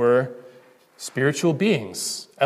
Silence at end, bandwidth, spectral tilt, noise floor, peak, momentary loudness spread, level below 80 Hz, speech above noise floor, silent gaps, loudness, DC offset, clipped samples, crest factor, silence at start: 0 s; 15.5 kHz; -4.5 dB/octave; -52 dBFS; -6 dBFS; 14 LU; -70 dBFS; 30 dB; none; -23 LUFS; under 0.1%; under 0.1%; 16 dB; 0 s